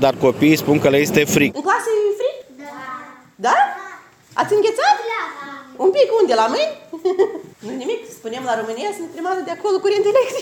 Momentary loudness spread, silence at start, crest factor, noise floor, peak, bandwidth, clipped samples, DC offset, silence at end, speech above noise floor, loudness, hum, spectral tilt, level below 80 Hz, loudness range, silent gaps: 17 LU; 0 s; 16 dB; -40 dBFS; -2 dBFS; 17 kHz; under 0.1%; under 0.1%; 0 s; 23 dB; -18 LUFS; none; -4.5 dB/octave; -58 dBFS; 4 LU; none